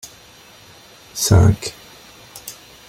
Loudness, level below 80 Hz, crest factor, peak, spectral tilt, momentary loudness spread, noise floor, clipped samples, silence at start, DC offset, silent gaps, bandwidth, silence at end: -16 LUFS; -38 dBFS; 20 dB; -2 dBFS; -5 dB/octave; 26 LU; -45 dBFS; under 0.1%; 1.15 s; under 0.1%; none; 16.5 kHz; 0.35 s